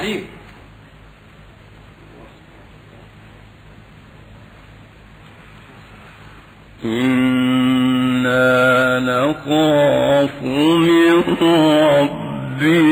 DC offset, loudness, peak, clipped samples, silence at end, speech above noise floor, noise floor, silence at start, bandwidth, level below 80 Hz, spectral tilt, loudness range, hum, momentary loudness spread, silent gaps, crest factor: under 0.1%; -15 LUFS; -4 dBFS; under 0.1%; 0 s; 30 dB; -43 dBFS; 0 s; over 20 kHz; -48 dBFS; -6 dB/octave; 10 LU; none; 11 LU; none; 12 dB